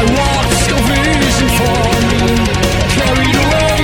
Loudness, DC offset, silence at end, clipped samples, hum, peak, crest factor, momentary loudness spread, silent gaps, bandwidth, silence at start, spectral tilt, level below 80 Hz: -12 LUFS; under 0.1%; 0 s; under 0.1%; none; 0 dBFS; 12 dB; 1 LU; none; 19 kHz; 0 s; -4.5 dB/octave; -20 dBFS